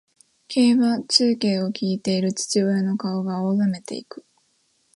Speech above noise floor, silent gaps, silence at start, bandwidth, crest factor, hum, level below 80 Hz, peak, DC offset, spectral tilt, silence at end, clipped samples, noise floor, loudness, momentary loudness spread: 45 dB; none; 0.5 s; 11.5 kHz; 20 dB; none; -70 dBFS; -4 dBFS; under 0.1%; -5 dB/octave; 0.75 s; under 0.1%; -66 dBFS; -21 LUFS; 10 LU